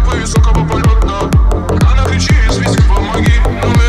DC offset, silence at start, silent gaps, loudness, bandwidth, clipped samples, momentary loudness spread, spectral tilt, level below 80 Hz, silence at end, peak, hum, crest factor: under 0.1%; 0 s; none; -12 LUFS; 12.5 kHz; under 0.1%; 2 LU; -6 dB/octave; -12 dBFS; 0 s; -2 dBFS; none; 8 dB